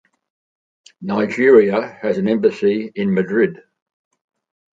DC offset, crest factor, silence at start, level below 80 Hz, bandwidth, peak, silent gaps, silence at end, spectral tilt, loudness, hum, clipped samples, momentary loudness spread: under 0.1%; 18 dB; 1 s; -62 dBFS; 7.6 kHz; 0 dBFS; none; 1.2 s; -7.5 dB/octave; -17 LUFS; none; under 0.1%; 10 LU